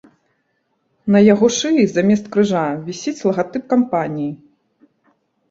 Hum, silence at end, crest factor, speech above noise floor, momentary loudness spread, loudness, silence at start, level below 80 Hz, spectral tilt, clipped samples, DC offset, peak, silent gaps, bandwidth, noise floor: none; 1.15 s; 16 dB; 52 dB; 13 LU; -17 LUFS; 1.05 s; -58 dBFS; -5.5 dB/octave; under 0.1%; under 0.1%; -2 dBFS; none; 7.8 kHz; -67 dBFS